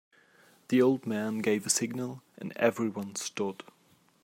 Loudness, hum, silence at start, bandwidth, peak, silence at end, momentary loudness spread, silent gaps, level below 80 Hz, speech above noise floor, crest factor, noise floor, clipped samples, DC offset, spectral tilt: -30 LUFS; none; 0.7 s; 16 kHz; -10 dBFS; 0.7 s; 14 LU; none; -80 dBFS; 36 dB; 20 dB; -65 dBFS; under 0.1%; under 0.1%; -4 dB/octave